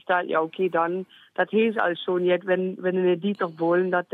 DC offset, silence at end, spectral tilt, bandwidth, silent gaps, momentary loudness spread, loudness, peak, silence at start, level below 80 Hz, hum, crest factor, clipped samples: under 0.1%; 0.1 s; -8.5 dB/octave; 4.5 kHz; none; 5 LU; -24 LUFS; -8 dBFS; 0.1 s; -82 dBFS; none; 16 dB; under 0.1%